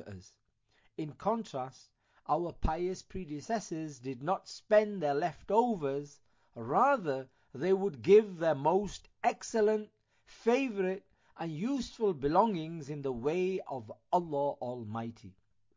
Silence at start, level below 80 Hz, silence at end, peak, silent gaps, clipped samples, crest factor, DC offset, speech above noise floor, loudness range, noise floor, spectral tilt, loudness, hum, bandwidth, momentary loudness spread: 0 s; -52 dBFS; 0.45 s; -14 dBFS; none; under 0.1%; 20 dB; under 0.1%; 40 dB; 7 LU; -72 dBFS; -6 dB/octave; -32 LUFS; none; 7.6 kHz; 14 LU